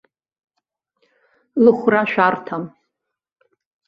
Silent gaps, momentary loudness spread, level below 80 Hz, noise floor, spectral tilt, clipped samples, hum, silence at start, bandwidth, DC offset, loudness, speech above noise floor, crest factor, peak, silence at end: none; 15 LU; -66 dBFS; -78 dBFS; -8 dB/octave; under 0.1%; none; 1.55 s; 5.6 kHz; under 0.1%; -17 LUFS; 62 dB; 20 dB; -2 dBFS; 1.2 s